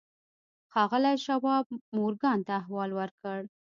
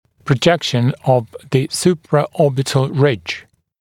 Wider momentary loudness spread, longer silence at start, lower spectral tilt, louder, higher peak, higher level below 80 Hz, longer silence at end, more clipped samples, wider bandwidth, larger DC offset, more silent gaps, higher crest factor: first, 10 LU vs 6 LU; first, 0.75 s vs 0.25 s; about the same, -6.5 dB/octave vs -5.5 dB/octave; second, -30 LUFS vs -17 LUFS; second, -14 dBFS vs 0 dBFS; second, -80 dBFS vs -52 dBFS; about the same, 0.35 s vs 0.4 s; neither; second, 7.4 kHz vs 16 kHz; neither; first, 1.66-1.70 s, 1.81-1.92 s, 3.11-3.18 s vs none; about the same, 18 dB vs 16 dB